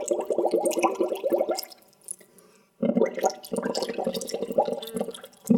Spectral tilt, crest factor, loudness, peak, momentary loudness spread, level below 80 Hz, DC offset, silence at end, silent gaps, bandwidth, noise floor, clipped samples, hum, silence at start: -5 dB/octave; 20 dB; -27 LUFS; -6 dBFS; 15 LU; -70 dBFS; under 0.1%; 0 s; none; 19 kHz; -57 dBFS; under 0.1%; none; 0 s